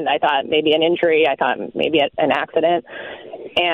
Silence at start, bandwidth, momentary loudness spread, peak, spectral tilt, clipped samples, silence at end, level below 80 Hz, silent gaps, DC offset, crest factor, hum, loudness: 0 s; 6.2 kHz; 14 LU; -4 dBFS; -6 dB/octave; under 0.1%; 0 s; -60 dBFS; none; under 0.1%; 14 dB; none; -18 LUFS